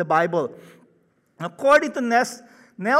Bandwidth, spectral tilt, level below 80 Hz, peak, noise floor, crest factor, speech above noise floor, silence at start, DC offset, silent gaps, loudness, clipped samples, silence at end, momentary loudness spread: 15 kHz; -4.5 dB/octave; -68 dBFS; -6 dBFS; -63 dBFS; 16 dB; 42 dB; 0 s; under 0.1%; none; -21 LUFS; under 0.1%; 0 s; 17 LU